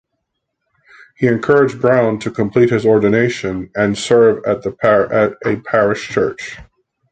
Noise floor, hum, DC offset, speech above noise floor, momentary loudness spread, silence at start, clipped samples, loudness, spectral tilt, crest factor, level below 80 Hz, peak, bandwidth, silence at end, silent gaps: -74 dBFS; none; under 0.1%; 59 dB; 8 LU; 1.2 s; under 0.1%; -15 LUFS; -6.5 dB/octave; 14 dB; -48 dBFS; 0 dBFS; 9.2 kHz; 0.5 s; none